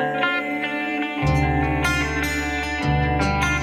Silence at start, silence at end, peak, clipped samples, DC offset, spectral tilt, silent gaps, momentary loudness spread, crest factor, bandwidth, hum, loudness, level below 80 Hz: 0 s; 0 s; -8 dBFS; under 0.1%; under 0.1%; -5.5 dB/octave; none; 4 LU; 14 dB; 15.5 kHz; none; -22 LUFS; -30 dBFS